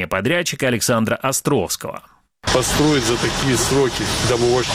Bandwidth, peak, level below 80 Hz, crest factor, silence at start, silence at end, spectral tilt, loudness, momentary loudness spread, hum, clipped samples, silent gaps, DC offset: 16.5 kHz; -2 dBFS; -38 dBFS; 16 dB; 0 s; 0 s; -4 dB/octave; -18 LUFS; 7 LU; none; under 0.1%; none; under 0.1%